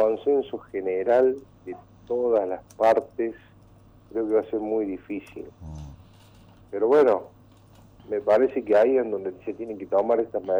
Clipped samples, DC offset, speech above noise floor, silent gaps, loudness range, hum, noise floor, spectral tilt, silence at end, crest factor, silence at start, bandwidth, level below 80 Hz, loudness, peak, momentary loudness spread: under 0.1%; under 0.1%; 29 dB; none; 7 LU; none; -52 dBFS; -7.5 dB/octave; 0 s; 14 dB; 0 s; over 20 kHz; -58 dBFS; -24 LUFS; -10 dBFS; 21 LU